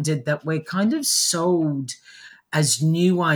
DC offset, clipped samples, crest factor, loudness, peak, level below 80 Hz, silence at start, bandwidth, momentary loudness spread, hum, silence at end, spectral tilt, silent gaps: under 0.1%; under 0.1%; 14 dB; -21 LUFS; -8 dBFS; -70 dBFS; 0 s; over 20 kHz; 9 LU; none; 0 s; -4 dB/octave; none